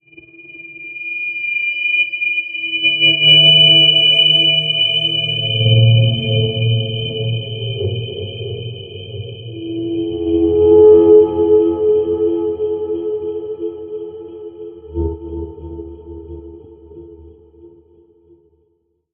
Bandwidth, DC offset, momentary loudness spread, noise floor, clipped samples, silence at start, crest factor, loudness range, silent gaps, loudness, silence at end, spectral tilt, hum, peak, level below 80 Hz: 3.7 kHz; under 0.1%; 24 LU; -64 dBFS; under 0.1%; 0.4 s; 16 dB; 19 LU; none; -12 LUFS; 1.45 s; -7 dB/octave; none; 0 dBFS; -42 dBFS